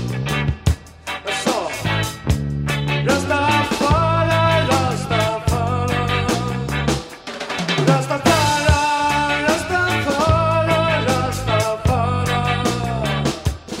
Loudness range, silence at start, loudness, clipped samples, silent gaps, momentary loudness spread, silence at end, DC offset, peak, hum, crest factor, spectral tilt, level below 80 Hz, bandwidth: 3 LU; 0 s; -19 LUFS; under 0.1%; none; 6 LU; 0 s; under 0.1%; -2 dBFS; none; 16 dB; -5 dB/octave; -32 dBFS; 16 kHz